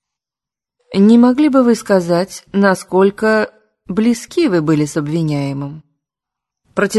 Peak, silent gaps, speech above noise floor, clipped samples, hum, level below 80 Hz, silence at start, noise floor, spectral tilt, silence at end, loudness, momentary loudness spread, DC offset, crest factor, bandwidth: 0 dBFS; none; 75 dB; under 0.1%; none; -54 dBFS; 0.9 s; -88 dBFS; -6.5 dB/octave; 0 s; -14 LUFS; 12 LU; under 0.1%; 14 dB; 12.5 kHz